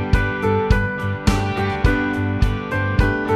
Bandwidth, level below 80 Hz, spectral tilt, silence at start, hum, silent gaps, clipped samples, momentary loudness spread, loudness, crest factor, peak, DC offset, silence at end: 13.5 kHz; -24 dBFS; -7 dB/octave; 0 s; none; none; under 0.1%; 3 LU; -20 LUFS; 18 dB; -2 dBFS; under 0.1%; 0 s